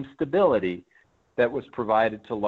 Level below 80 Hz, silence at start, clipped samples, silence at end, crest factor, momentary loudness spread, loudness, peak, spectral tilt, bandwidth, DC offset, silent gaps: -60 dBFS; 0 s; under 0.1%; 0 s; 16 dB; 11 LU; -24 LUFS; -10 dBFS; -8 dB/octave; 4.9 kHz; under 0.1%; none